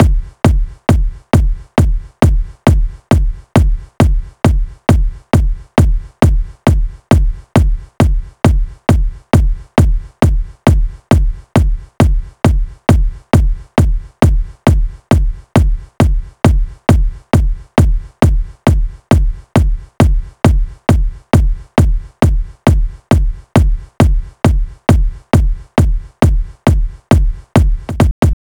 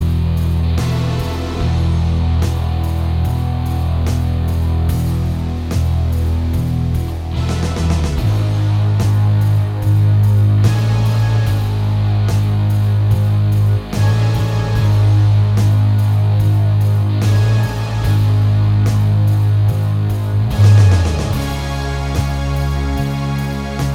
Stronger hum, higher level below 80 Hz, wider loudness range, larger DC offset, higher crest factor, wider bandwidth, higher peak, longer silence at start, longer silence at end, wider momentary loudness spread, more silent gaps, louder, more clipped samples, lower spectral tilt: neither; first, -14 dBFS vs -24 dBFS; second, 1 LU vs 4 LU; neither; about the same, 12 dB vs 12 dB; first, 17 kHz vs 14 kHz; about the same, 0 dBFS vs -2 dBFS; about the same, 0 s vs 0 s; about the same, 0.1 s vs 0 s; second, 3 LU vs 7 LU; first, 28.11-28.22 s vs none; about the same, -15 LUFS vs -16 LUFS; neither; about the same, -7.5 dB/octave vs -7 dB/octave